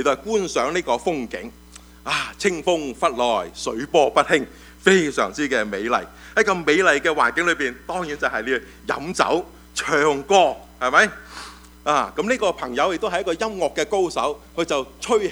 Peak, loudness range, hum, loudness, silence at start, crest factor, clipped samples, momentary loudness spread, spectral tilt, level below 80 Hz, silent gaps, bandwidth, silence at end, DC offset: 0 dBFS; 4 LU; none; -21 LUFS; 0 s; 22 dB; under 0.1%; 11 LU; -3.5 dB/octave; -48 dBFS; none; over 20 kHz; 0 s; under 0.1%